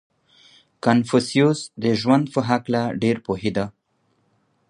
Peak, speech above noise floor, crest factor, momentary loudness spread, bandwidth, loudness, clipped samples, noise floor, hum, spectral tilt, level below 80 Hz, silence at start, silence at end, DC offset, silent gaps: -2 dBFS; 47 dB; 20 dB; 7 LU; 11 kHz; -21 LUFS; under 0.1%; -67 dBFS; none; -6 dB/octave; -56 dBFS; 0.85 s; 1 s; under 0.1%; none